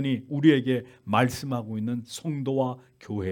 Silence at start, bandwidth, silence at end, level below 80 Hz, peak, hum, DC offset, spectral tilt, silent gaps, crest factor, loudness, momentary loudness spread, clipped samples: 0 s; 18 kHz; 0 s; -64 dBFS; -6 dBFS; none; under 0.1%; -6.5 dB/octave; none; 20 dB; -27 LUFS; 12 LU; under 0.1%